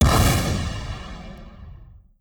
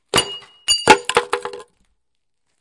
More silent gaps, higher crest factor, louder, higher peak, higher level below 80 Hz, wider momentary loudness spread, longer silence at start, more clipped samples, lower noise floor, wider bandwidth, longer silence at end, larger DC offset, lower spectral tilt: neither; about the same, 18 dB vs 20 dB; second, -22 LUFS vs -17 LUFS; second, -6 dBFS vs 0 dBFS; first, -28 dBFS vs -50 dBFS; first, 25 LU vs 15 LU; second, 0 s vs 0.15 s; neither; second, -45 dBFS vs -78 dBFS; first, over 20 kHz vs 12 kHz; second, 0.25 s vs 1 s; neither; first, -5 dB/octave vs -1.5 dB/octave